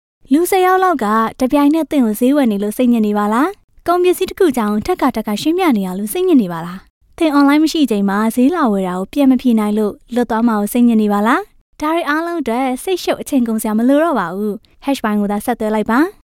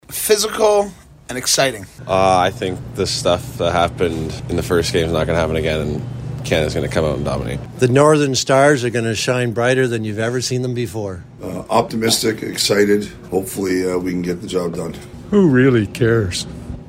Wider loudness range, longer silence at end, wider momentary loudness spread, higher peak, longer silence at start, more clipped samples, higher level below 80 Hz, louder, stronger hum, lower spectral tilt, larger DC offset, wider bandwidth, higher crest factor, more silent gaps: about the same, 3 LU vs 3 LU; first, 0.2 s vs 0 s; second, 7 LU vs 12 LU; about the same, -2 dBFS vs 0 dBFS; first, 0.3 s vs 0.1 s; neither; second, -46 dBFS vs -38 dBFS; about the same, -15 LUFS vs -17 LUFS; neither; about the same, -5.5 dB/octave vs -4.5 dB/octave; neither; about the same, 17 kHz vs 16 kHz; about the same, 12 dB vs 16 dB; first, 3.64-3.68 s, 6.90-7.01 s, 11.61-11.73 s vs none